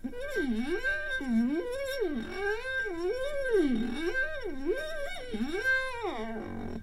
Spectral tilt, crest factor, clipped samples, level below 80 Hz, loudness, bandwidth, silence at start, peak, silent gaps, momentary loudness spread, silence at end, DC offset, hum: -5 dB/octave; 14 dB; under 0.1%; -44 dBFS; -32 LUFS; 13.5 kHz; 0 s; -16 dBFS; none; 8 LU; 0 s; 0.2%; none